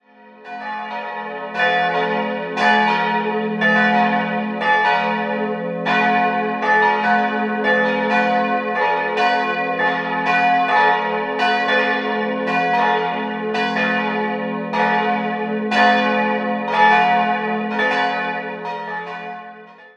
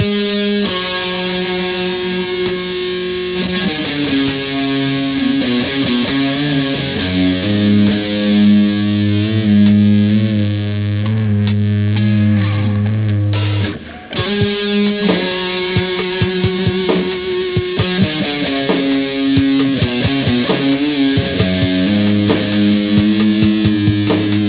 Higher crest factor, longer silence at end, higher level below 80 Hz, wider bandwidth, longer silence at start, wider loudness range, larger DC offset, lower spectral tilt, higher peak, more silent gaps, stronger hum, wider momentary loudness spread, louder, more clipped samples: about the same, 18 dB vs 14 dB; about the same, 0.1 s vs 0 s; second, -68 dBFS vs -36 dBFS; first, 8.6 kHz vs 4 kHz; first, 0.25 s vs 0 s; about the same, 2 LU vs 4 LU; neither; second, -5.5 dB/octave vs -11 dB/octave; about the same, 0 dBFS vs 0 dBFS; neither; neither; first, 12 LU vs 6 LU; second, -18 LUFS vs -15 LUFS; neither